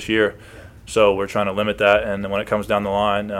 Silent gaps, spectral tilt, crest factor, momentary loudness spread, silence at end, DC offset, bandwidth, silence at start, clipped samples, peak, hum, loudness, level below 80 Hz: none; -5 dB/octave; 18 dB; 6 LU; 0 s; under 0.1%; 15.5 kHz; 0 s; under 0.1%; -2 dBFS; none; -19 LUFS; -44 dBFS